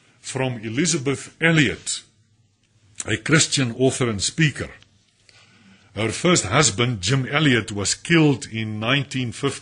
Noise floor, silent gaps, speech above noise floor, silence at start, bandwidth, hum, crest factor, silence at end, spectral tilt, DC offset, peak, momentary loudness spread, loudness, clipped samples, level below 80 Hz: -61 dBFS; none; 41 dB; 0.25 s; 10.5 kHz; none; 20 dB; 0 s; -4 dB/octave; under 0.1%; -2 dBFS; 10 LU; -20 LUFS; under 0.1%; -52 dBFS